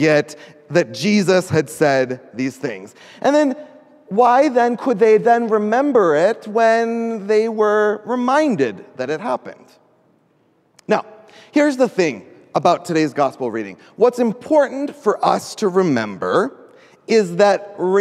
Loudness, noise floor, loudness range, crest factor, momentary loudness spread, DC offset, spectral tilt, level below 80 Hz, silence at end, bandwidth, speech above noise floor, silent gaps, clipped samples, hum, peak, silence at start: -17 LUFS; -59 dBFS; 6 LU; 16 dB; 11 LU; under 0.1%; -5.5 dB/octave; -66 dBFS; 0 s; 13.5 kHz; 42 dB; none; under 0.1%; none; 0 dBFS; 0 s